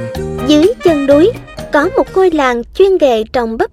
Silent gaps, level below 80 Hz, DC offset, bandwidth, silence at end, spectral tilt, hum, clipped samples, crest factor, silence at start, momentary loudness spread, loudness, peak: none; -34 dBFS; under 0.1%; 14.5 kHz; 0.05 s; -5.5 dB/octave; none; under 0.1%; 12 dB; 0 s; 7 LU; -11 LUFS; 0 dBFS